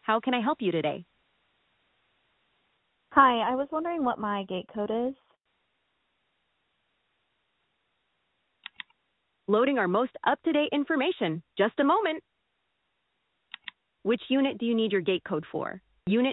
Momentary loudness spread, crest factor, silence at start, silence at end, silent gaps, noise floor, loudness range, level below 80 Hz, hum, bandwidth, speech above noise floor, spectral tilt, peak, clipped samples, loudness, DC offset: 19 LU; 24 dB; 0.05 s; 0 s; none; -78 dBFS; 8 LU; -70 dBFS; none; 4.1 kHz; 51 dB; -9.5 dB/octave; -6 dBFS; under 0.1%; -27 LUFS; under 0.1%